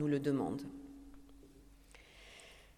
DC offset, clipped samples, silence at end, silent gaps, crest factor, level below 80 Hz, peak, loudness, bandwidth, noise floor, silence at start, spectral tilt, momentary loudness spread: under 0.1%; under 0.1%; 0.15 s; none; 18 dB; -64 dBFS; -22 dBFS; -38 LUFS; 15 kHz; -60 dBFS; 0 s; -7.5 dB/octave; 26 LU